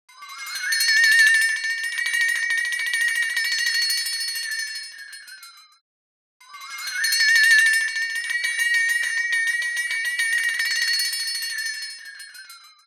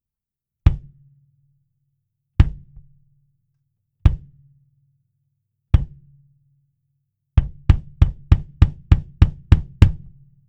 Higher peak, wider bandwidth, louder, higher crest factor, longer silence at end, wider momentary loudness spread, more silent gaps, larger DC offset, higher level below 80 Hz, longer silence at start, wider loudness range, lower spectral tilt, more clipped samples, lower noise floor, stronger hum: second, -4 dBFS vs 0 dBFS; first, 17.5 kHz vs 5.8 kHz; about the same, -19 LUFS vs -20 LUFS; about the same, 20 dB vs 20 dB; second, 0.2 s vs 0.5 s; first, 21 LU vs 6 LU; first, 5.81-6.40 s vs none; neither; second, -86 dBFS vs -24 dBFS; second, 0.2 s vs 0.65 s; second, 6 LU vs 9 LU; second, 6.5 dB/octave vs -8.5 dB/octave; neither; second, -45 dBFS vs -88 dBFS; neither